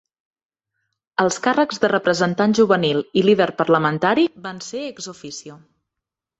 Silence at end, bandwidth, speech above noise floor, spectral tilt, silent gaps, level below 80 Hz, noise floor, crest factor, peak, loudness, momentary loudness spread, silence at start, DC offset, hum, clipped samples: 0.85 s; 8.2 kHz; 66 dB; -5 dB/octave; none; -62 dBFS; -84 dBFS; 18 dB; -2 dBFS; -18 LUFS; 15 LU; 1.2 s; under 0.1%; none; under 0.1%